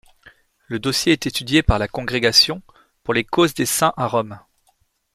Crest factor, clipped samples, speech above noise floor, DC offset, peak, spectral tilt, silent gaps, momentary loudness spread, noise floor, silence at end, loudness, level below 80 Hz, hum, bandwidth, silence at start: 20 dB; under 0.1%; 45 dB; under 0.1%; -2 dBFS; -3.5 dB/octave; none; 13 LU; -64 dBFS; 0.75 s; -18 LUFS; -36 dBFS; none; 15.5 kHz; 0.7 s